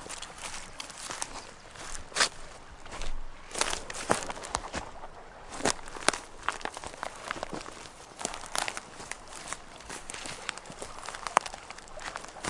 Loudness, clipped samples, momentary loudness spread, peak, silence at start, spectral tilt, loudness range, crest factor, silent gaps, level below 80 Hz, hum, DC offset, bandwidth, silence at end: -35 LUFS; under 0.1%; 15 LU; 0 dBFS; 0 s; -1.5 dB/octave; 5 LU; 36 dB; none; -48 dBFS; none; under 0.1%; 11.5 kHz; 0 s